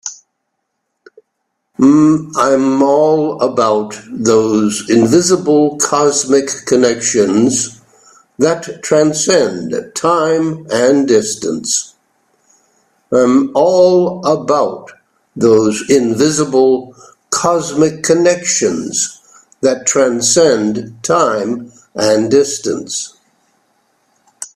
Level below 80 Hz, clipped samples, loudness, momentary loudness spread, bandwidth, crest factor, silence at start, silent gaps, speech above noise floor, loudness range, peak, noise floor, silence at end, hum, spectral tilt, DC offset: -56 dBFS; under 0.1%; -13 LUFS; 9 LU; 14 kHz; 14 dB; 0.05 s; none; 59 dB; 3 LU; 0 dBFS; -71 dBFS; 0.1 s; none; -4 dB/octave; under 0.1%